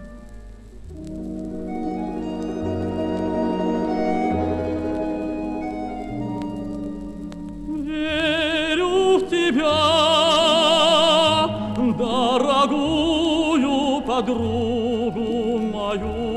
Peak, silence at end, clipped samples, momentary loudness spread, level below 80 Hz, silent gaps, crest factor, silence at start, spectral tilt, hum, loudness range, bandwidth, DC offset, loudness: -4 dBFS; 0 s; under 0.1%; 15 LU; -42 dBFS; none; 16 dB; 0 s; -4.5 dB/octave; none; 10 LU; 12.5 kHz; under 0.1%; -21 LUFS